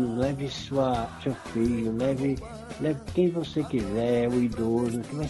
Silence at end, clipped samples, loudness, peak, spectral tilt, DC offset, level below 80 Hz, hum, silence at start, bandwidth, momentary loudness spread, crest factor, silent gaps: 0 s; under 0.1%; -28 LUFS; -12 dBFS; -7 dB/octave; under 0.1%; -48 dBFS; none; 0 s; 11.5 kHz; 6 LU; 14 dB; none